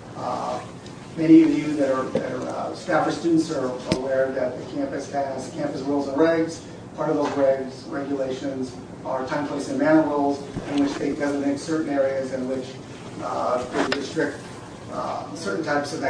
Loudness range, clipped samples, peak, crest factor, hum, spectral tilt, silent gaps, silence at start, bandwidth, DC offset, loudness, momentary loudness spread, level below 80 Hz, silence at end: 5 LU; under 0.1%; -4 dBFS; 20 dB; none; -6 dB/octave; none; 0 s; 10.5 kHz; under 0.1%; -24 LUFS; 12 LU; -56 dBFS; 0 s